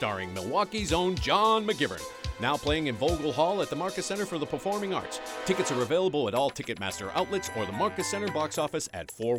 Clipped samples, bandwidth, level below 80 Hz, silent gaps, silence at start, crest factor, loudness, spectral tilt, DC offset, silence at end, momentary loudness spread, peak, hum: under 0.1%; 17 kHz; -48 dBFS; none; 0 s; 18 dB; -29 LUFS; -4 dB/octave; under 0.1%; 0 s; 7 LU; -10 dBFS; none